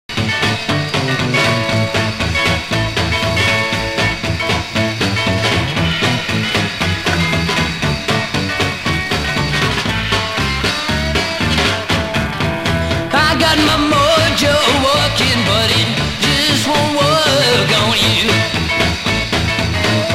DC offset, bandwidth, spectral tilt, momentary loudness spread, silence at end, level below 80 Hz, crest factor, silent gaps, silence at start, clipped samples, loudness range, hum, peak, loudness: under 0.1%; 16 kHz; -4 dB/octave; 5 LU; 0 s; -32 dBFS; 14 dB; none; 0.1 s; under 0.1%; 4 LU; none; 0 dBFS; -14 LUFS